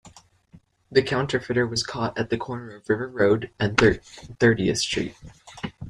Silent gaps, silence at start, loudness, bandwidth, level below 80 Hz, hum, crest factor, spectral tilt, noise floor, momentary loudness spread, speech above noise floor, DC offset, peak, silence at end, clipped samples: none; 0.05 s; -23 LUFS; 13.5 kHz; -48 dBFS; none; 24 dB; -5 dB/octave; -55 dBFS; 14 LU; 31 dB; under 0.1%; -2 dBFS; 0 s; under 0.1%